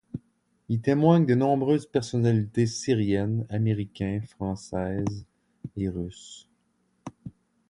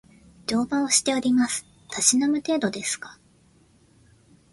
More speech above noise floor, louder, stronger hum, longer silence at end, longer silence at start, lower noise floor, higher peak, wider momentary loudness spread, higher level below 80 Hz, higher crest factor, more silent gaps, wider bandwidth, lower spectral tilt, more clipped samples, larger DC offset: first, 45 dB vs 35 dB; second, -26 LUFS vs -23 LUFS; neither; second, 0.4 s vs 1.4 s; second, 0.15 s vs 0.5 s; first, -71 dBFS vs -58 dBFS; second, -8 dBFS vs -4 dBFS; first, 22 LU vs 13 LU; first, -52 dBFS vs -62 dBFS; about the same, 20 dB vs 20 dB; neither; about the same, 11 kHz vs 11.5 kHz; first, -7 dB/octave vs -2 dB/octave; neither; neither